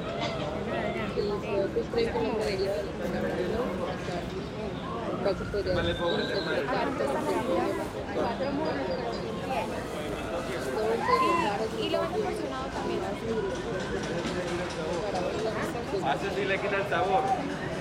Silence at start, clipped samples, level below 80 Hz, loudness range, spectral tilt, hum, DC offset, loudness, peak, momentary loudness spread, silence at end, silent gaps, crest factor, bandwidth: 0 s; under 0.1%; -48 dBFS; 2 LU; -5.5 dB/octave; none; under 0.1%; -30 LUFS; -12 dBFS; 6 LU; 0 s; none; 18 dB; 16 kHz